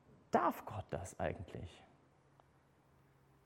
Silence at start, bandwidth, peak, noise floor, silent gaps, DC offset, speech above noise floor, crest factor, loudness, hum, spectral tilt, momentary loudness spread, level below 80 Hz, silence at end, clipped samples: 0.1 s; 17 kHz; -20 dBFS; -70 dBFS; none; under 0.1%; 28 dB; 24 dB; -41 LUFS; none; -6 dB/octave; 17 LU; -66 dBFS; 1.6 s; under 0.1%